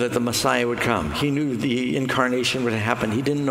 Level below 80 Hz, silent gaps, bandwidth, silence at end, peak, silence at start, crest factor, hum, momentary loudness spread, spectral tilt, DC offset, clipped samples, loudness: -48 dBFS; none; 16 kHz; 0 s; -2 dBFS; 0 s; 20 dB; none; 3 LU; -4.5 dB/octave; under 0.1%; under 0.1%; -22 LUFS